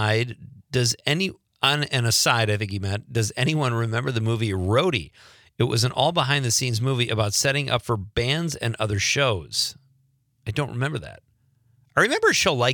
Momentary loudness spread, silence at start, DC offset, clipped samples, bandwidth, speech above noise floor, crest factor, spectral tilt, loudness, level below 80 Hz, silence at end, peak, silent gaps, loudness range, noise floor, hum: 9 LU; 0 s; under 0.1%; under 0.1%; 19.5 kHz; 42 dB; 20 dB; -4 dB/octave; -23 LUFS; -52 dBFS; 0 s; -4 dBFS; none; 3 LU; -65 dBFS; none